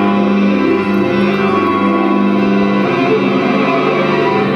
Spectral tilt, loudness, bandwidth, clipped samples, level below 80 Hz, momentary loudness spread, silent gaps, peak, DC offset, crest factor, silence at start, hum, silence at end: -7.5 dB/octave; -13 LUFS; 6.6 kHz; under 0.1%; -50 dBFS; 1 LU; none; -2 dBFS; under 0.1%; 10 dB; 0 s; none; 0 s